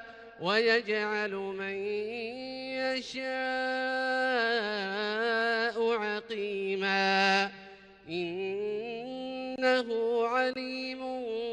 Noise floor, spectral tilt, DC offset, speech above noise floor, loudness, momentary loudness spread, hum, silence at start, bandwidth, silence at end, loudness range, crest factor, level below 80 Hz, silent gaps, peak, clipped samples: -51 dBFS; -4 dB/octave; under 0.1%; 21 dB; -30 LUFS; 11 LU; none; 0 s; 10 kHz; 0 s; 3 LU; 18 dB; -72 dBFS; none; -14 dBFS; under 0.1%